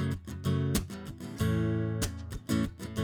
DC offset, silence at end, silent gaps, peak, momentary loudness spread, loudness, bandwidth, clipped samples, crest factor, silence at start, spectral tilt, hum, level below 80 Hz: under 0.1%; 0 s; none; -14 dBFS; 12 LU; -33 LUFS; over 20 kHz; under 0.1%; 18 dB; 0 s; -6 dB/octave; none; -44 dBFS